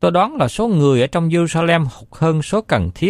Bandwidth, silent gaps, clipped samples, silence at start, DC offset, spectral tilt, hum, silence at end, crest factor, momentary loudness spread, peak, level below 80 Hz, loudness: 12 kHz; none; under 0.1%; 0 s; under 0.1%; -6.5 dB/octave; none; 0 s; 14 dB; 5 LU; -2 dBFS; -40 dBFS; -17 LUFS